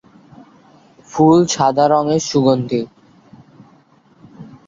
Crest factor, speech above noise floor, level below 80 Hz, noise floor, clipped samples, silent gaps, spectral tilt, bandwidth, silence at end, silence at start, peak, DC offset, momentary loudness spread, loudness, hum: 16 dB; 37 dB; -56 dBFS; -51 dBFS; under 0.1%; none; -5.5 dB/octave; 7.8 kHz; 0.2 s; 1.1 s; -2 dBFS; under 0.1%; 11 LU; -15 LUFS; none